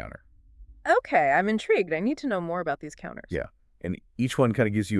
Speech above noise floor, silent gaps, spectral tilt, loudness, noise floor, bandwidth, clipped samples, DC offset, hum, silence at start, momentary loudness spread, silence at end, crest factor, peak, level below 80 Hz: 26 dB; none; -6.5 dB/octave; -26 LUFS; -52 dBFS; 12 kHz; under 0.1%; under 0.1%; none; 0 s; 16 LU; 0 s; 18 dB; -8 dBFS; -54 dBFS